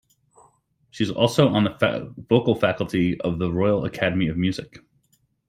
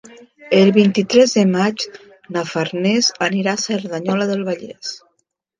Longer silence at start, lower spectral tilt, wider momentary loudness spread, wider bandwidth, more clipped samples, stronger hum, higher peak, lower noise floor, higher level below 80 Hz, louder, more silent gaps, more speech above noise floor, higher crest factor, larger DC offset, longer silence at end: first, 0.95 s vs 0.4 s; first, -6.5 dB/octave vs -4.5 dB/octave; second, 8 LU vs 14 LU; first, 15.5 kHz vs 9.6 kHz; neither; neither; second, -4 dBFS vs 0 dBFS; second, -66 dBFS vs -70 dBFS; first, -52 dBFS vs -64 dBFS; second, -22 LUFS vs -17 LUFS; neither; second, 45 dB vs 53 dB; about the same, 20 dB vs 18 dB; neither; first, 0.85 s vs 0.65 s